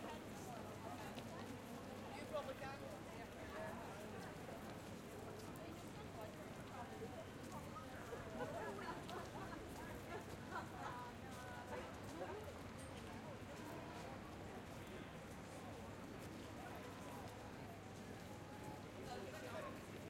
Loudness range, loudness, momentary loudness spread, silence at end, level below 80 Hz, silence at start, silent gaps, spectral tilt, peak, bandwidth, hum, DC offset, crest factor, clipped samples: 3 LU; -52 LUFS; 4 LU; 0 s; -68 dBFS; 0 s; none; -5 dB/octave; -34 dBFS; 16 kHz; none; under 0.1%; 16 dB; under 0.1%